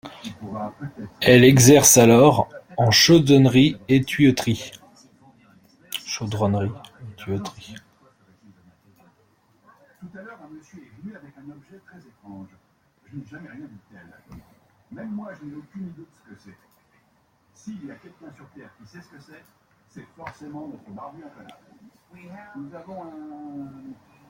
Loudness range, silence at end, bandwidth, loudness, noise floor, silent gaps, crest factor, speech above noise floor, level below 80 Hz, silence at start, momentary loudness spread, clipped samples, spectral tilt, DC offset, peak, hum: 28 LU; 0.4 s; 16.5 kHz; -17 LUFS; -63 dBFS; none; 22 dB; 42 dB; -56 dBFS; 0.05 s; 29 LU; under 0.1%; -4.5 dB/octave; under 0.1%; 0 dBFS; none